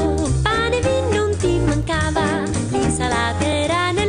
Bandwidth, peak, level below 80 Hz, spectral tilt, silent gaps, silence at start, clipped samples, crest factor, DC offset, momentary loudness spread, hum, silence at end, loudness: 10.5 kHz; -4 dBFS; -30 dBFS; -5 dB/octave; none; 0 s; under 0.1%; 14 dB; under 0.1%; 2 LU; none; 0 s; -19 LUFS